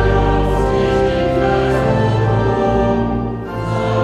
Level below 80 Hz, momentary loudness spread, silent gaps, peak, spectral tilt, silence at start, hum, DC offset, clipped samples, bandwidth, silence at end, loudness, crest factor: -24 dBFS; 5 LU; none; -2 dBFS; -7.5 dB/octave; 0 s; none; under 0.1%; under 0.1%; 11 kHz; 0 s; -16 LUFS; 12 dB